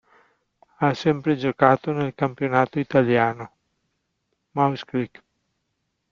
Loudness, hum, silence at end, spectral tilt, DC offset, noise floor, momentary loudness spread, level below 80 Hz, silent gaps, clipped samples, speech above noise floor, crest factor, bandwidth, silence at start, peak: -22 LUFS; none; 1.05 s; -8 dB/octave; under 0.1%; -76 dBFS; 11 LU; -62 dBFS; none; under 0.1%; 54 dB; 22 dB; 7.4 kHz; 0.8 s; -2 dBFS